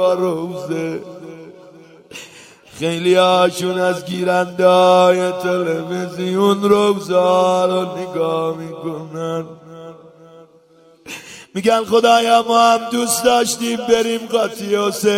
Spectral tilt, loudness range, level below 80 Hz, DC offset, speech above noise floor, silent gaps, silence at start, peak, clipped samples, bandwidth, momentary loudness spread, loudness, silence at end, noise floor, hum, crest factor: -4 dB/octave; 9 LU; -60 dBFS; under 0.1%; 34 dB; none; 0 s; 0 dBFS; under 0.1%; 16.5 kHz; 20 LU; -16 LUFS; 0 s; -50 dBFS; none; 16 dB